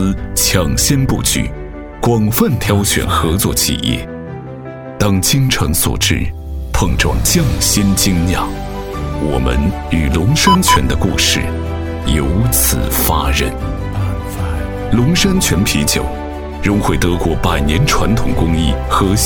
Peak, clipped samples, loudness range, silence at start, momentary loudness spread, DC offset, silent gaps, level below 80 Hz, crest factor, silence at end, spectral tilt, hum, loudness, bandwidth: 0 dBFS; under 0.1%; 2 LU; 0 s; 10 LU; under 0.1%; none; -22 dBFS; 14 dB; 0 s; -4 dB/octave; none; -14 LUFS; 19.5 kHz